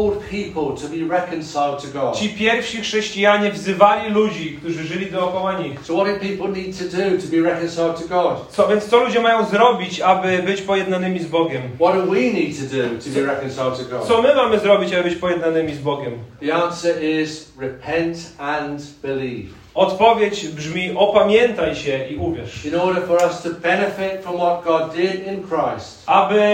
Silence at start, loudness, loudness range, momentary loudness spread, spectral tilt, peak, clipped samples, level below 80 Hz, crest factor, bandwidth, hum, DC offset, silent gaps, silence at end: 0 s; -19 LUFS; 5 LU; 11 LU; -5 dB/octave; 0 dBFS; under 0.1%; -52 dBFS; 18 dB; 16 kHz; none; under 0.1%; none; 0 s